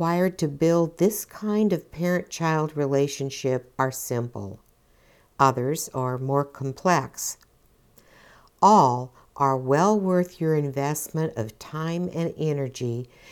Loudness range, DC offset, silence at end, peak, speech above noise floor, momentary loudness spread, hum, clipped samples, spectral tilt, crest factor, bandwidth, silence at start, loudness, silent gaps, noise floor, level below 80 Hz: 5 LU; under 0.1%; 0 s; -4 dBFS; 36 dB; 10 LU; none; under 0.1%; -6 dB/octave; 20 dB; 19 kHz; 0 s; -24 LUFS; none; -60 dBFS; -60 dBFS